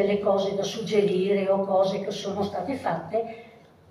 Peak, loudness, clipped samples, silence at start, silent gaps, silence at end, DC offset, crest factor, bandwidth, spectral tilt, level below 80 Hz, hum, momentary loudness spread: -10 dBFS; -26 LUFS; under 0.1%; 0 s; none; 0.4 s; under 0.1%; 16 dB; 12.5 kHz; -6 dB/octave; -66 dBFS; none; 7 LU